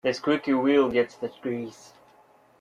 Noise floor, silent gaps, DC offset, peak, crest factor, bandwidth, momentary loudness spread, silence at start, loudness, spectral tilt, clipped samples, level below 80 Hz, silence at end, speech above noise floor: -58 dBFS; none; under 0.1%; -8 dBFS; 18 dB; 10 kHz; 13 LU; 0.05 s; -25 LUFS; -5.5 dB/octave; under 0.1%; -66 dBFS; 0.9 s; 33 dB